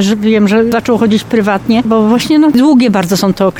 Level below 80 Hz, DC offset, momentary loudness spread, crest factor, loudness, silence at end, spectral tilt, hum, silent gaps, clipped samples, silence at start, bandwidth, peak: -42 dBFS; under 0.1%; 4 LU; 8 dB; -10 LUFS; 0 s; -6 dB/octave; none; none; under 0.1%; 0 s; 17.5 kHz; 0 dBFS